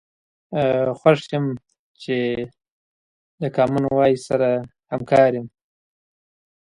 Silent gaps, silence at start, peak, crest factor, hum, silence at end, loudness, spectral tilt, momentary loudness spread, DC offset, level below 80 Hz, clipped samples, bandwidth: 1.79-1.94 s, 2.70-3.38 s; 0.5 s; 0 dBFS; 22 dB; none; 1.15 s; -20 LUFS; -7 dB/octave; 14 LU; under 0.1%; -58 dBFS; under 0.1%; 11 kHz